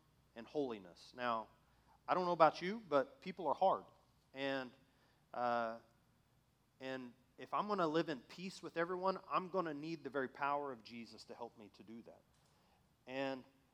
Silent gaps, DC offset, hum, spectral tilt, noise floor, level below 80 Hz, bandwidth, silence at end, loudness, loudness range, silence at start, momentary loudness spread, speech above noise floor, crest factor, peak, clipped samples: none; under 0.1%; none; -6 dB/octave; -75 dBFS; -82 dBFS; 14 kHz; 0.3 s; -40 LUFS; 8 LU; 0.35 s; 20 LU; 35 dB; 28 dB; -14 dBFS; under 0.1%